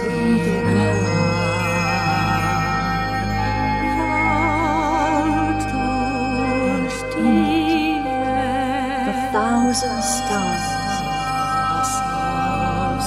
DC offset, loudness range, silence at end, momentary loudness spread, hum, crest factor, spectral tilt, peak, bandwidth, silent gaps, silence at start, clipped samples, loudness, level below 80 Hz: under 0.1%; 1 LU; 0 s; 4 LU; none; 14 dB; -5 dB/octave; -6 dBFS; 16 kHz; none; 0 s; under 0.1%; -20 LUFS; -36 dBFS